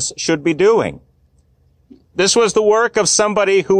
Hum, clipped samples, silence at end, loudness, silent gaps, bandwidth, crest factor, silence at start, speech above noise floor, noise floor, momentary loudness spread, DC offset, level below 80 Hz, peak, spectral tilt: none; under 0.1%; 0 s; -14 LUFS; none; 10.5 kHz; 12 dB; 0 s; 41 dB; -56 dBFS; 5 LU; under 0.1%; -52 dBFS; -4 dBFS; -3 dB/octave